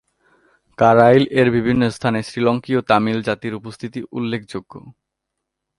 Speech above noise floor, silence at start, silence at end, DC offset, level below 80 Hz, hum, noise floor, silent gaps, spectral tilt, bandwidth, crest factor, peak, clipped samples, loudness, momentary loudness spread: 62 dB; 0.8 s; 0.9 s; under 0.1%; -52 dBFS; none; -79 dBFS; none; -7 dB/octave; 11.5 kHz; 18 dB; 0 dBFS; under 0.1%; -17 LUFS; 17 LU